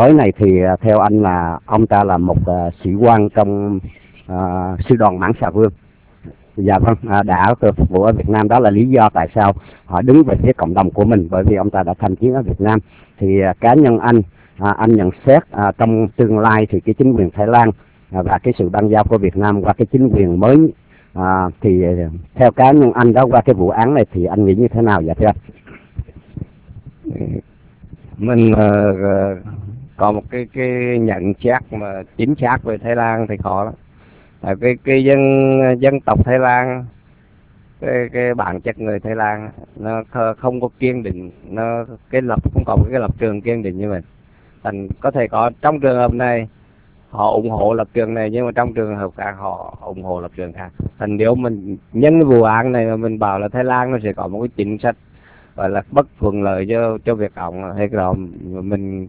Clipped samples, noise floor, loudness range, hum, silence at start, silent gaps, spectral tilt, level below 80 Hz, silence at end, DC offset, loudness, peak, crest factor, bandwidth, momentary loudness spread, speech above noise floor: 0.2%; -48 dBFS; 7 LU; none; 0 s; none; -12.5 dB/octave; -32 dBFS; 0 s; under 0.1%; -15 LUFS; 0 dBFS; 14 dB; 4 kHz; 15 LU; 34 dB